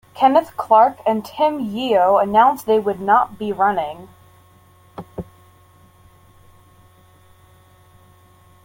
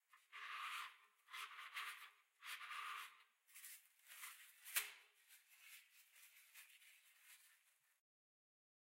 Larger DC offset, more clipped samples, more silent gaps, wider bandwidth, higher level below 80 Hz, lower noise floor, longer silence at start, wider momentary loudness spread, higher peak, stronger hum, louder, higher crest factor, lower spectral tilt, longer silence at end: neither; neither; neither; about the same, 17 kHz vs 16 kHz; first, -56 dBFS vs under -90 dBFS; second, -51 dBFS vs -78 dBFS; about the same, 0.15 s vs 0.1 s; about the same, 21 LU vs 19 LU; first, -2 dBFS vs -26 dBFS; neither; first, -17 LUFS vs -52 LUFS; second, 18 dB vs 32 dB; first, -6 dB/octave vs 5.5 dB/octave; first, 3.4 s vs 1.3 s